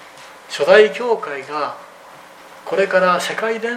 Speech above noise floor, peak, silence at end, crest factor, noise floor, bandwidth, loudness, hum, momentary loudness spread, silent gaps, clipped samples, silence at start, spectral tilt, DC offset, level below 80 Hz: 25 dB; 0 dBFS; 0 s; 18 dB; -41 dBFS; 15 kHz; -17 LUFS; none; 16 LU; none; under 0.1%; 0 s; -3.5 dB/octave; under 0.1%; -66 dBFS